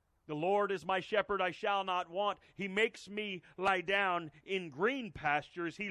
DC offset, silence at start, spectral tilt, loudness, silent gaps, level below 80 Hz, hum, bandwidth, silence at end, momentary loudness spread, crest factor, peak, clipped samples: under 0.1%; 0.3 s; -5 dB/octave; -35 LUFS; none; -70 dBFS; none; 11.5 kHz; 0 s; 8 LU; 20 dB; -16 dBFS; under 0.1%